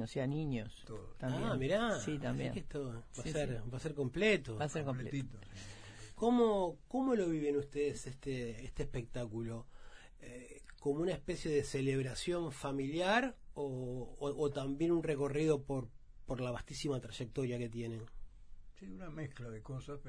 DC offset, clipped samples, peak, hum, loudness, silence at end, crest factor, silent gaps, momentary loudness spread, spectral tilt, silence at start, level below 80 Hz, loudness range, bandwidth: under 0.1%; under 0.1%; -20 dBFS; none; -38 LUFS; 0 s; 18 dB; none; 16 LU; -6 dB/octave; 0 s; -54 dBFS; 7 LU; 10.5 kHz